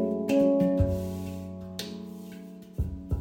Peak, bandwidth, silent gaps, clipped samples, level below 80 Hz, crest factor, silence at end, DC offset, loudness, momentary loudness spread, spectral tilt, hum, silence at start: -12 dBFS; 17 kHz; none; under 0.1%; -42 dBFS; 16 dB; 0 s; under 0.1%; -29 LUFS; 18 LU; -7.5 dB/octave; none; 0 s